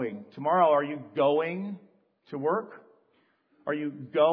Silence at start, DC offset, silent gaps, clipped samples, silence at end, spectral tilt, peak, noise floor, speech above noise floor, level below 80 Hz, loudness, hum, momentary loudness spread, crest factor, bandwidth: 0 s; under 0.1%; none; under 0.1%; 0 s; -9.5 dB/octave; -10 dBFS; -69 dBFS; 42 dB; -86 dBFS; -28 LUFS; none; 17 LU; 18 dB; 5 kHz